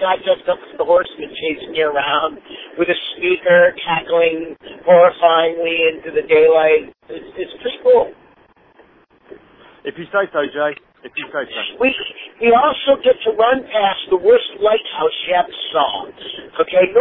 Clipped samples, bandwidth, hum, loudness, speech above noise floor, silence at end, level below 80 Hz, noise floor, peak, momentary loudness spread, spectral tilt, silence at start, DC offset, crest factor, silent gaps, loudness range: under 0.1%; 4 kHz; none; -16 LUFS; 35 dB; 0 s; -56 dBFS; -51 dBFS; 0 dBFS; 16 LU; -7.5 dB/octave; 0 s; under 0.1%; 16 dB; none; 8 LU